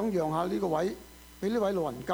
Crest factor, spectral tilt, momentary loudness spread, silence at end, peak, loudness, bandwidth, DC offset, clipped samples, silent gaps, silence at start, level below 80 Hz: 16 dB; -6.5 dB/octave; 10 LU; 0 s; -14 dBFS; -31 LUFS; over 20 kHz; under 0.1%; under 0.1%; none; 0 s; -56 dBFS